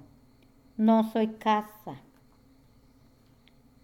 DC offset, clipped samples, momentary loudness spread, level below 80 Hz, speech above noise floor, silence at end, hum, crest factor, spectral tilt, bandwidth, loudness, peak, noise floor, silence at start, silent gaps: under 0.1%; under 0.1%; 21 LU; -66 dBFS; 34 dB; 1.85 s; none; 18 dB; -7 dB/octave; 15.5 kHz; -26 LUFS; -12 dBFS; -60 dBFS; 0.8 s; none